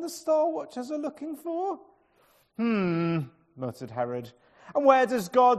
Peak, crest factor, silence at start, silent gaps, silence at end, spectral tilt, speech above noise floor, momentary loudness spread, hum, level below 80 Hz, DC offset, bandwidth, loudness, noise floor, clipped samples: -6 dBFS; 20 dB; 0 s; none; 0 s; -6.5 dB/octave; 38 dB; 16 LU; none; -72 dBFS; under 0.1%; 14 kHz; -28 LUFS; -64 dBFS; under 0.1%